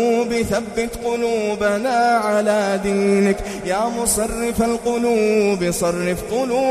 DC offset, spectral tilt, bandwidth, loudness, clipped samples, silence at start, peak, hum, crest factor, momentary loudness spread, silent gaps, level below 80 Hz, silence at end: under 0.1%; -4.5 dB/octave; 15.5 kHz; -19 LUFS; under 0.1%; 0 s; -4 dBFS; none; 14 dB; 5 LU; none; -40 dBFS; 0 s